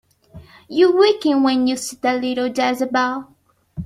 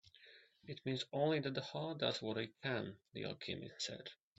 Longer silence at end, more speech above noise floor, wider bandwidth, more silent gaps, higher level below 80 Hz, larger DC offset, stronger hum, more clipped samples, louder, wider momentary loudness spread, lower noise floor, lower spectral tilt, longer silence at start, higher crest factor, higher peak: second, 0 s vs 0.25 s; about the same, 26 dB vs 23 dB; first, 15 kHz vs 8 kHz; neither; first, -54 dBFS vs -80 dBFS; neither; neither; neither; first, -18 LUFS vs -42 LUFS; second, 9 LU vs 17 LU; second, -44 dBFS vs -65 dBFS; about the same, -4 dB/octave vs -3.5 dB/octave; first, 0.35 s vs 0.05 s; about the same, 16 dB vs 20 dB; first, -2 dBFS vs -22 dBFS